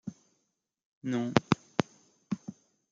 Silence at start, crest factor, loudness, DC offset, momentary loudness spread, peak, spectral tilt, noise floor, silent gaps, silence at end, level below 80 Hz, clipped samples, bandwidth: 0.05 s; 32 dB; -32 LUFS; under 0.1%; 16 LU; -2 dBFS; -6 dB/octave; -81 dBFS; 0.85-1.01 s; 0.4 s; -66 dBFS; under 0.1%; 7.8 kHz